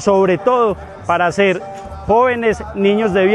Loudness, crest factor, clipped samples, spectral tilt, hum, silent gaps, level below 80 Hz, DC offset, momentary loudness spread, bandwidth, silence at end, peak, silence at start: -15 LUFS; 14 dB; under 0.1%; -6 dB/octave; none; none; -40 dBFS; under 0.1%; 10 LU; 10.5 kHz; 0 s; -2 dBFS; 0 s